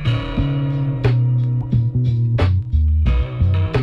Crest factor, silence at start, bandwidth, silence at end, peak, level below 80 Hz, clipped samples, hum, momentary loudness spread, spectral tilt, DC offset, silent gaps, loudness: 14 dB; 0 s; 5.4 kHz; 0 s; -2 dBFS; -24 dBFS; under 0.1%; none; 3 LU; -9 dB/octave; under 0.1%; none; -18 LUFS